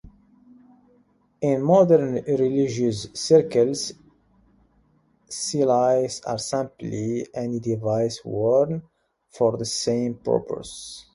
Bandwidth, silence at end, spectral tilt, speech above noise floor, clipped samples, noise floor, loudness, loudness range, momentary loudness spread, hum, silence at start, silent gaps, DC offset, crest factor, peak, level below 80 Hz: 11.5 kHz; 0.15 s; -5.5 dB/octave; 40 dB; under 0.1%; -62 dBFS; -23 LUFS; 5 LU; 12 LU; none; 0.05 s; none; under 0.1%; 20 dB; -4 dBFS; -58 dBFS